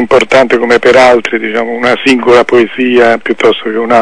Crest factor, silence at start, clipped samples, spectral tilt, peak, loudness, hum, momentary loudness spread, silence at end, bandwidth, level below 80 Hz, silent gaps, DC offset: 8 dB; 0 s; 4%; -4.5 dB/octave; 0 dBFS; -7 LUFS; none; 7 LU; 0 s; 11 kHz; -42 dBFS; none; 2%